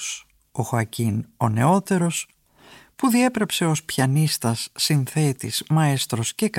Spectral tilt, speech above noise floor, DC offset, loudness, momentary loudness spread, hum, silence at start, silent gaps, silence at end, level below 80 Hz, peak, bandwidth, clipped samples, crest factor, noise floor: -5 dB/octave; 29 dB; under 0.1%; -22 LUFS; 8 LU; none; 0 s; none; 0 s; -60 dBFS; -6 dBFS; 17 kHz; under 0.1%; 16 dB; -50 dBFS